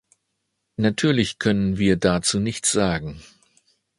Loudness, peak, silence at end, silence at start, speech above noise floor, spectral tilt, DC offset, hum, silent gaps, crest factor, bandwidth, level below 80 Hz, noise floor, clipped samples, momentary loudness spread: -21 LUFS; -4 dBFS; 0.8 s; 0.8 s; 55 dB; -4.5 dB/octave; under 0.1%; none; none; 20 dB; 11.5 kHz; -46 dBFS; -76 dBFS; under 0.1%; 7 LU